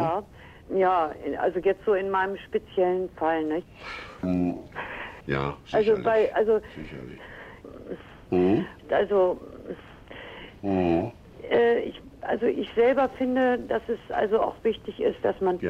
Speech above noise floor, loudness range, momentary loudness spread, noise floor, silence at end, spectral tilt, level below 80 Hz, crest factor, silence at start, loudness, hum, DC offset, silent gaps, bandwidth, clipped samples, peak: 22 dB; 3 LU; 18 LU; -47 dBFS; 0 s; -8 dB/octave; -54 dBFS; 14 dB; 0 s; -26 LUFS; none; under 0.1%; none; 7.8 kHz; under 0.1%; -12 dBFS